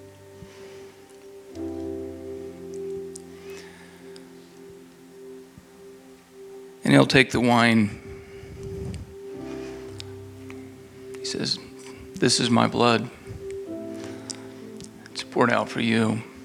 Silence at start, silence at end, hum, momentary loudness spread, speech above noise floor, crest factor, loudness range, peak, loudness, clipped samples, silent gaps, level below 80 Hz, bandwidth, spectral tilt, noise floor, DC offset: 0 s; 0 s; none; 26 LU; 27 dB; 26 dB; 18 LU; 0 dBFS; -24 LUFS; under 0.1%; none; -54 dBFS; 14.5 kHz; -4.5 dB/octave; -48 dBFS; under 0.1%